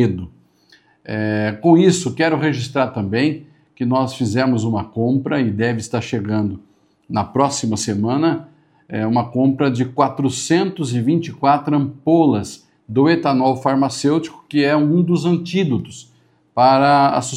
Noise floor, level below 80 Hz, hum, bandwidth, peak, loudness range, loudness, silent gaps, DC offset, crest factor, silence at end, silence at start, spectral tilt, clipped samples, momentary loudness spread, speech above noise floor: -54 dBFS; -56 dBFS; none; 12 kHz; 0 dBFS; 3 LU; -18 LUFS; none; under 0.1%; 18 dB; 0 s; 0 s; -6 dB/octave; under 0.1%; 10 LU; 37 dB